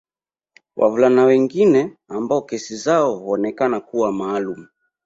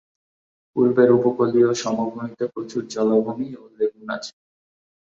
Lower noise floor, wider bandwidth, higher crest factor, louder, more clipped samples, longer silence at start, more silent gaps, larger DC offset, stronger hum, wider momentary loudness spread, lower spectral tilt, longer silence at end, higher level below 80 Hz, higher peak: about the same, under -90 dBFS vs under -90 dBFS; about the same, 7.8 kHz vs 7.8 kHz; about the same, 16 dB vs 20 dB; first, -18 LUFS vs -21 LUFS; neither; about the same, 0.75 s vs 0.75 s; neither; neither; neither; about the same, 14 LU vs 14 LU; about the same, -6 dB/octave vs -6 dB/octave; second, 0.4 s vs 0.85 s; about the same, -62 dBFS vs -66 dBFS; about the same, -2 dBFS vs -2 dBFS